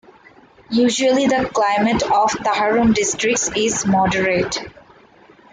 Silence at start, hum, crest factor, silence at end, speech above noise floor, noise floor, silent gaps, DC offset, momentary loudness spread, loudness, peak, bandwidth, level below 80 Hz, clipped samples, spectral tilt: 0.7 s; none; 12 dB; 0.85 s; 31 dB; -48 dBFS; none; under 0.1%; 4 LU; -17 LUFS; -6 dBFS; 9.6 kHz; -46 dBFS; under 0.1%; -3.5 dB/octave